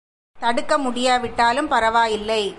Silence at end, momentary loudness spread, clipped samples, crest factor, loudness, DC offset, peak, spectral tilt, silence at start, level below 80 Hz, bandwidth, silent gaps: 0 s; 5 LU; under 0.1%; 14 dB; -20 LUFS; under 0.1%; -6 dBFS; -3 dB/octave; 0.35 s; -48 dBFS; 11.5 kHz; none